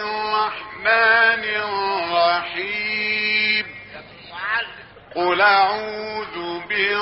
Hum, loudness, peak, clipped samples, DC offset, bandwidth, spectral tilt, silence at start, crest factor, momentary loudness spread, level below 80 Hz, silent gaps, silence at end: none; -19 LUFS; -4 dBFS; under 0.1%; under 0.1%; 6 kHz; 1 dB/octave; 0 s; 16 dB; 16 LU; -60 dBFS; none; 0 s